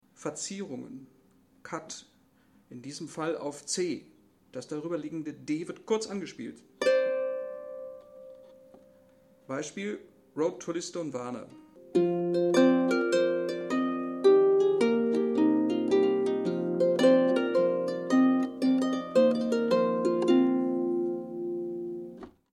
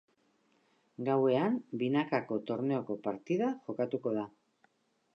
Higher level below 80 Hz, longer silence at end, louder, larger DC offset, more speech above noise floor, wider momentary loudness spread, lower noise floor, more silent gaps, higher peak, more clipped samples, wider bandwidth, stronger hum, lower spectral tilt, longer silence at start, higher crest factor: first, -74 dBFS vs -84 dBFS; second, 0.25 s vs 0.85 s; first, -28 LUFS vs -33 LUFS; neither; second, 30 dB vs 40 dB; first, 18 LU vs 9 LU; second, -64 dBFS vs -72 dBFS; neither; first, -10 dBFS vs -18 dBFS; neither; first, 11.5 kHz vs 6.6 kHz; neither; second, -5.5 dB/octave vs -8 dB/octave; second, 0.2 s vs 1 s; about the same, 18 dB vs 16 dB